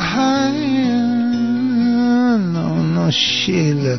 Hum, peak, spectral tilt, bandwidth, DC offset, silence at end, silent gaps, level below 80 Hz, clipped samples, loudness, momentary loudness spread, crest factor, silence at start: none; -4 dBFS; -5.5 dB/octave; 6.4 kHz; 0.5%; 0 s; none; -50 dBFS; under 0.1%; -16 LUFS; 3 LU; 12 dB; 0 s